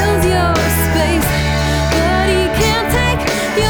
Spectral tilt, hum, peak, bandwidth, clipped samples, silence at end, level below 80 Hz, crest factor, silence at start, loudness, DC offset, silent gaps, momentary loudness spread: -4.5 dB/octave; none; -2 dBFS; over 20 kHz; under 0.1%; 0 s; -22 dBFS; 12 dB; 0 s; -14 LUFS; under 0.1%; none; 2 LU